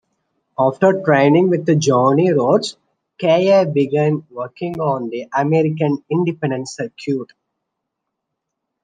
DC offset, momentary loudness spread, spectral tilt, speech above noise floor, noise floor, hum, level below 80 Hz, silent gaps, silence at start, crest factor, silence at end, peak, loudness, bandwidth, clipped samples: under 0.1%; 12 LU; -6.5 dB/octave; 62 dB; -78 dBFS; none; -64 dBFS; none; 0.6 s; 16 dB; 1.6 s; -2 dBFS; -17 LUFS; 9.6 kHz; under 0.1%